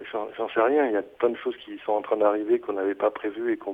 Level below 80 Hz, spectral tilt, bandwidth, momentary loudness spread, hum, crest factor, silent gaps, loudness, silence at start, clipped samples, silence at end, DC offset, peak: -72 dBFS; -7 dB/octave; 3.8 kHz; 10 LU; none; 16 dB; none; -26 LUFS; 0 s; under 0.1%; 0 s; under 0.1%; -10 dBFS